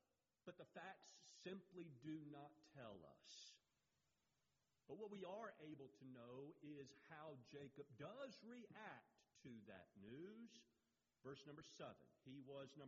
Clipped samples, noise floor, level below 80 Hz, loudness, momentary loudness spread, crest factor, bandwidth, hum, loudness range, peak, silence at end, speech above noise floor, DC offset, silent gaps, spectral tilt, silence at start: under 0.1%; -90 dBFS; under -90 dBFS; -60 LUFS; 8 LU; 20 dB; 7.4 kHz; none; 3 LU; -42 dBFS; 0 s; 30 dB; under 0.1%; none; -4.5 dB/octave; 0.45 s